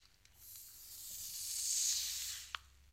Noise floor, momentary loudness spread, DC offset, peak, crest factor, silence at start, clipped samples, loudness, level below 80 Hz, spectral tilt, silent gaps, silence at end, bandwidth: -62 dBFS; 19 LU; under 0.1%; -22 dBFS; 20 dB; 0.05 s; under 0.1%; -38 LUFS; -70 dBFS; 3.5 dB/octave; none; 0 s; 16 kHz